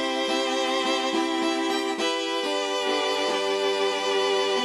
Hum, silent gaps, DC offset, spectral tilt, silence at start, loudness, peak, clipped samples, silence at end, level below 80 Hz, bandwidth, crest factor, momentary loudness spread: none; none; under 0.1%; -1.5 dB/octave; 0 s; -24 LUFS; -12 dBFS; under 0.1%; 0 s; -70 dBFS; 13.5 kHz; 12 dB; 2 LU